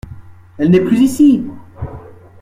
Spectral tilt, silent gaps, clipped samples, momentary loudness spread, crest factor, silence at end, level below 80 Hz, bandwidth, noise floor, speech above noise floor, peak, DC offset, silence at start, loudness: -7.5 dB/octave; none; under 0.1%; 19 LU; 14 dB; 0.4 s; -42 dBFS; 15 kHz; -35 dBFS; 24 dB; 0 dBFS; under 0.1%; 0.05 s; -12 LUFS